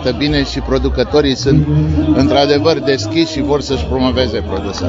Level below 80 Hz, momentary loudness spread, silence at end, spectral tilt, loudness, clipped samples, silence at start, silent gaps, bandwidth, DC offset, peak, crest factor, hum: -26 dBFS; 5 LU; 0 s; -6 dB/octave; -14 LUFS; under 0.1%; 0 s; none; 7.8 kHz; under 0.1%; 0 dBFS; 14 dB; none